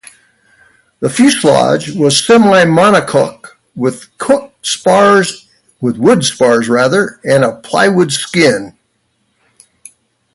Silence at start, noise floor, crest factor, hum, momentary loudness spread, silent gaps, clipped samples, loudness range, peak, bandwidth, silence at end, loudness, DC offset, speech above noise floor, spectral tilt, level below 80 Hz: 1 s; -62 dBFS; 12 dB; none; 11 LU; none; under 0.1%; 3 LU; 0 dBFS; 11.5 kHz; 1.65 s; -11 LUFS; under 0.1%; 52 dB; -4.5 dB/octave; -52 dBFS